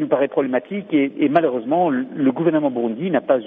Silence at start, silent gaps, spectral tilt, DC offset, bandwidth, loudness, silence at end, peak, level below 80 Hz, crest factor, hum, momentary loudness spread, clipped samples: 0 s; none; -6 dB/octave; under 0.1%; 3.8 kHz; -20 LUFS; 0 s; -2 dBFS; -68 dBFS; 16 dB; none; 4 LU; under 0.1%